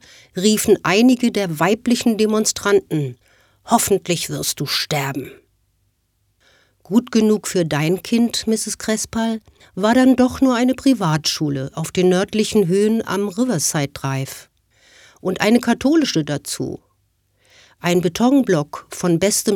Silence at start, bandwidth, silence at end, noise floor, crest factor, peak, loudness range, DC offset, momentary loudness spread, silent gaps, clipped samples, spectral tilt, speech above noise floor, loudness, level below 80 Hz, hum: 0.35 s; 18 kHz; 0 s; -66 dBFS; 18 dB; 0 dBFS; 5 LU; under 0.1%; 10 LU; none; under 0.1%; -4.5 dB/octave; 48 dB; -18 LUFS; -52 dBFS; none